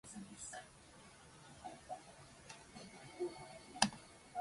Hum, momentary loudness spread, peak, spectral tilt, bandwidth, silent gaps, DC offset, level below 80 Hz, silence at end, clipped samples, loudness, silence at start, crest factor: none; 22 LU; -12 dBFS; -2.5 dB/octave; 11.5 kHz; none; under 0.1%; -72 dBFS; 0 s; under 0.1%; -45 LUFS; 0.05 s; 34 dB